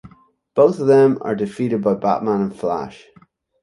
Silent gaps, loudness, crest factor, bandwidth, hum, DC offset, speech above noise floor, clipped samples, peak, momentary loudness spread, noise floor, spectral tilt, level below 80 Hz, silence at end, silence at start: none; -18 LUFS; 16 dB; 11 kHz; none; under 0.1%; 36 dB; under 0.1%; -2 dBFS; 11 LU; -53 dBFS; -8 dB/octave; -58 dBFS; 0.7 s; 0.05 s